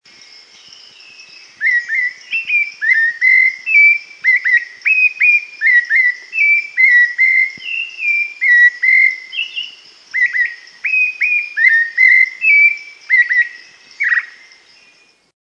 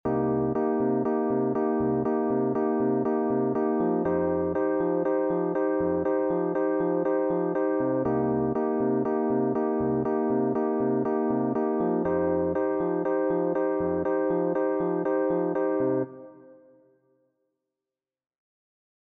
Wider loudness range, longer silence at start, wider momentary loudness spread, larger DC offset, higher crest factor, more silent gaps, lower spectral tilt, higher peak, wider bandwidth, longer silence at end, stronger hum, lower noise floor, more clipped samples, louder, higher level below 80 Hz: about the same, 3 LU vs 3 LU; first, 1.6 s vs 0.05 s; first, 11 LU vs 1 LU; neither; about the same, 14 dB vs 12 dB; neither; second, 2 dB/octave vs -10 dB/octave; first, 0 dBFS vs -14 dBFS; first, 7.6 kHz vs 2.9 kHz; second, 1.1 s vs 2.5 s; neither; second, -51 dBFS vs under -90 dBFS; neither; first, -11 LUFS vs -26 LUFS; second, -78 dBFS vs -58 dBFS